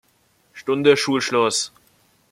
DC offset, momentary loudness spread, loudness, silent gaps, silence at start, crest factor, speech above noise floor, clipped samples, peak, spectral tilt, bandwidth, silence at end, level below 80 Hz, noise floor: under 0.1%; 12 LU; -19 LUFS; none; 0.55 s; 20 dB; 43 dB; under 0.1%; -2 dBFS; -3.5 dB/octave; 14 kHz; 0.65 s; -66 dBFS; -62 dBFS